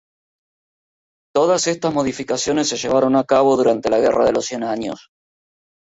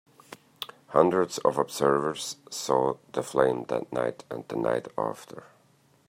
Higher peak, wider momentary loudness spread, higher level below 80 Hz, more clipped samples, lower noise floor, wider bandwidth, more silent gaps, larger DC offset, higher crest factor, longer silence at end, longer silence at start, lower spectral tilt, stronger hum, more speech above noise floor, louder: about the same, -4 dBFS vs -4 dBFS; second, 8 LU vs 16 LU; first, -54 dBFS vs -68 dBFS; neither; first, under -90 dBFS vs -63 dBFS; second, 8 kHz vs 16 kHz; neither; neither; second, 16 dB vs 24 dB; first, 0.9 s vs 0.65 s; first, 1.35 s vs 0.3 s; about the same, -4 dB/octave vs -4.5 dB/octave; neither; first, over 73 dB vs 36 dB; first, -18 LUFS vs -27 LUFS